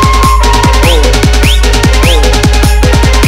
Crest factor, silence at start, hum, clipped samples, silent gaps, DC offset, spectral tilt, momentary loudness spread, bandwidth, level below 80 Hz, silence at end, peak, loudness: 6 dB; 0 s; none; 0.8%; none; under 0.1%; -4.5 dB/octave; 1 LU; 16.5 kHz; -8 dBFS; 0 s; 0 dBFS; -7 LUFS